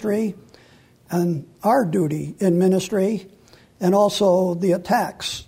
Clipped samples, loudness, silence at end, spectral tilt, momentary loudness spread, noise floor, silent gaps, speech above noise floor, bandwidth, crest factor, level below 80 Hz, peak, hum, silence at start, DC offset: under 0.1%; -21 LUFS; 0.05 s; -6 dB/octave; 7 LU; -52 dBFS; none; 32 dB; 16 kHz; 14 dB; -58 dBFS; -6 dBFS; none; 0 s; under 0.1%